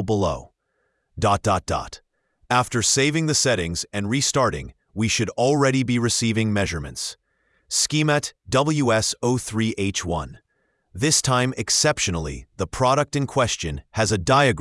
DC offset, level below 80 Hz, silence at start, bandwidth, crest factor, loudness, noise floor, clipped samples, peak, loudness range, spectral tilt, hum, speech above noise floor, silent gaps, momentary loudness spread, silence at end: under 0.1%; -44 dBFS; 0 s; 12 kHz; 20 dB; -21 LUFS; -71 dBFS; under 0.1%; -2 dBFS; 1 LU; -4 dB/octave; none; 50 dB; none; 11 LU; 0 s